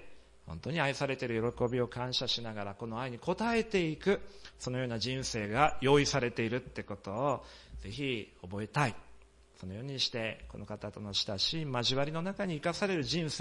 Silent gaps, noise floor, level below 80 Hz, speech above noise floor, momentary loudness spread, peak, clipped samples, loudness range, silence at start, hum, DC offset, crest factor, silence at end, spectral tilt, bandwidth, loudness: none; -57 dBFS; -56 dBFS; 24 dB; 13 LU; -10 dBFS; under 0.1%; 6 LU; 0 s; none; under 0.1%; 24 dB; 0 s; -4.5 dB/octave; 11.5 kHz; -33 LUFS